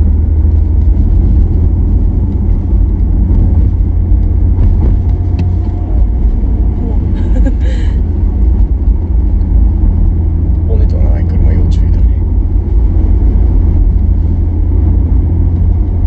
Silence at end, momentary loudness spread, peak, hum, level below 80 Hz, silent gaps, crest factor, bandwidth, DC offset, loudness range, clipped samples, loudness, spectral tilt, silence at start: 0 s; 3 LU; 0 dBFS; none; -10 dBFS; none; 8 dB; 3.2 kHz; under 0.1%; 1 LU; under 0.1%; -12 LUFS; -11 dB/octave; 0 s